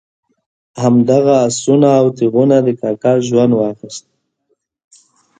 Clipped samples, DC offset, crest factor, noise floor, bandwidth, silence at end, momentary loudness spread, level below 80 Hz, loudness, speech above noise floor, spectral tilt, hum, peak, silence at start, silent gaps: under 0.1%; under 0.1%; 14 dB; -66 dBFS; 9.4 kHz; 1.4 s; 9 LU; -58 dBFS; -12 LUFS; 54 dB; -6.5 dB/octave; none; 0 dBFS; 0.75 s; none